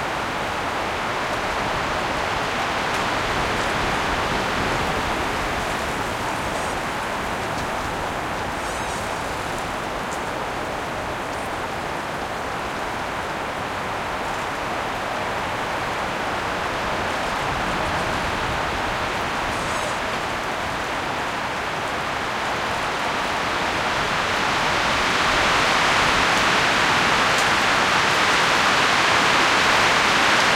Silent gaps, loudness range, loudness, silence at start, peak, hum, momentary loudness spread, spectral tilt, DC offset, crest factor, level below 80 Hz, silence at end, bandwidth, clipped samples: none; 9 LU; -21 LUFS; 0 s; -4 dBFS; none; 10 LU; -3 dB/octave; under 0.1%; 18 dB; -42 dBFS; 0 s; 16.5 kHz; under 0.1%